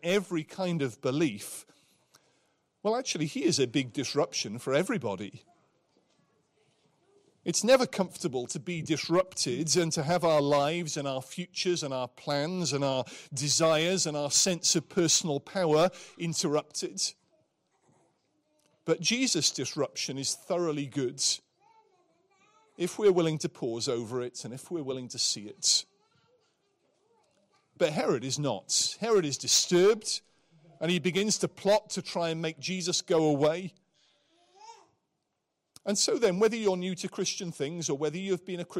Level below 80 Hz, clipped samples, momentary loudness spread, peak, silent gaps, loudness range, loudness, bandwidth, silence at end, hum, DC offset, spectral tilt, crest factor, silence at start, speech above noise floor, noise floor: -72 dBFS; under 0.1%; 11 LU; -12 dBFS; none; 5 LU; -29 LUFS; 16 kHz; 0 s; none; under 0.1%; -3.5 dB/octave; 18 dB; 0.05 s; 53 dB; -82 dBFS